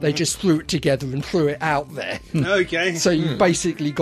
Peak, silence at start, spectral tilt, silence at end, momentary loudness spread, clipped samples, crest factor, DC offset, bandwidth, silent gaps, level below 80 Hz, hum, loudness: -4 dBFS; 0 s; -4.5 dB/octave; 0 s; 5 LU; under 0.1%; 16 dB; under 0.1%; 14 kHz; none; -46 dBFS; none; -21 LUFS